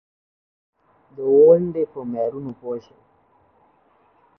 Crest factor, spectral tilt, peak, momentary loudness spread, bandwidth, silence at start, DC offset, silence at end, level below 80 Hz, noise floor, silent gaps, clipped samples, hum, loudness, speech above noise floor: 20 dB; -11.5 dB/octave; -4 dBFS; 19 LU; 3.1 kHz; 1.2 s; under 0.1%; 1.6 s; -64 dBFS; -59 dBFS; none; under 0.1%; none; -19 LUFS; 37 dB